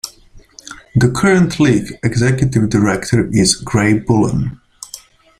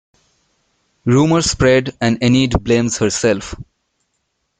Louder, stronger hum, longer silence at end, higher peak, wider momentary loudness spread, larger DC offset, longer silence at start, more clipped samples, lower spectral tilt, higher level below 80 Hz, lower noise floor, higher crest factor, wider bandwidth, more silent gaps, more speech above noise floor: about the same, -14 LUFS vs -15 LUFS; neither; second, 0.4 s vs 0.95 s; about the same, 0 dBFS vs 0 dBFS; first, 19 LU vs 10 LU; neither; second, 0.05 s vs 1.05 s; neither; about the same, -5.5 dB/octave vs -5 dB/octave; about the same, -38 dBFS vs -36 dBFS; second, -43 dBFS vs -70 dBFS; about the same, 14 dB vs 16 dB; first, 15.5 kHz vs 9.6 kHz; neither; second, 29 dB vs 55 dB